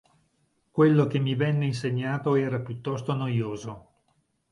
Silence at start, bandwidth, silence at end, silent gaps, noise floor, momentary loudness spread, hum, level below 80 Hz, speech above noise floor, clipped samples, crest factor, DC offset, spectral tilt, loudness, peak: 0.75 s; 11 kHz; 0.75 s; none; -71 dBFS; 13 LU; none; -64 dBFS; 46 dB; under 0.1%; 18 dB; under 0.1%; -8 dB/octave; -26 LUFS; -8 dBFS